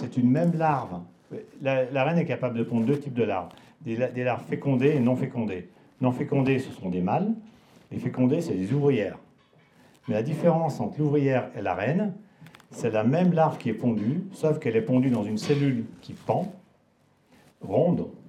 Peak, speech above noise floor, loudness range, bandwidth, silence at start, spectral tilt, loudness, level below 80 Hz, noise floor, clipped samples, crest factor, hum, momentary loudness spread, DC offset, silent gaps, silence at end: -8 dBFS; 39 dB; 3 LU; 12 kHz; 0 s; -8 dB/octave; -26 LUFS; -70 dBFS; -64 dBFS; under 0.1%; 18 dB; none; 14 LU; under 0.1%; none; 0.1 s